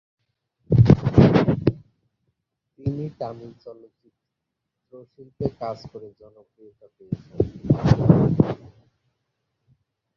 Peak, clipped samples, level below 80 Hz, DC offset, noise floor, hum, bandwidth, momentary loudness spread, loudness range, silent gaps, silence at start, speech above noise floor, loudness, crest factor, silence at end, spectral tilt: -2 dBFS; under 0.1%; -40 dBFS; under 0.1%; -82 dBFS; none; 6.6 kHz; 21 LU; 16 LU; none; 0.7 s; 57 dB; -20 LUFS; 22 dB; 1.6 s; -9.5 dB/octave